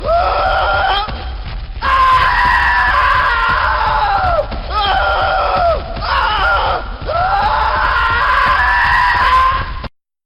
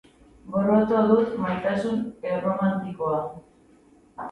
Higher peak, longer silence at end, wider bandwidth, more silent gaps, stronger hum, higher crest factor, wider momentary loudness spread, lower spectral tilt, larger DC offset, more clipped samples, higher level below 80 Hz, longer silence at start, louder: about the same, -4 dBFS vs -6 dBFS; first, 0.4 s vs 0 s; first, 13.5 kHz vs 9 kHz; neither; neither; second, 10 dB vs 18 dB; about the same, 10 LU vs 9 LU; second, -5 dB/octave vs -8.5 dB/octave; neither; neither; first, -24 dBFS vs -58 dBFS; second, 0 s vs 0.45 s; first, -13 LUFS vs -24 LUFS